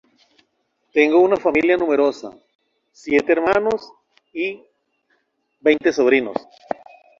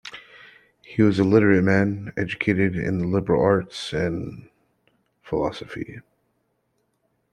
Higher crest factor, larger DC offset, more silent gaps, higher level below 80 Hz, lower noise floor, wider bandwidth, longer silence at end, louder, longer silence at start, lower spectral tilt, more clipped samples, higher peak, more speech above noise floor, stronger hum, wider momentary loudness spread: about the same, 18 dB vs 20 dB; neither; first, 2.55-2.59 s vs none; second, -60 dBFS vs -52 dBFS; about the same, -69 dBFS vs -71 dBFS; second, 7.6 kHz vs 10.5 kHz; second, 0.8 s vs 1.35 s; first, -18 LUFS vs -22 LUFS; first, 0.95 s vs 0.05 s; second, -5 dB/octave vs -7.5 dB/octave; neither; about the same, -2 dBFS vs -2 dBFS; about the same, 52 dB vs 50 dB; neither; about the same, 17 LU vs 17 LU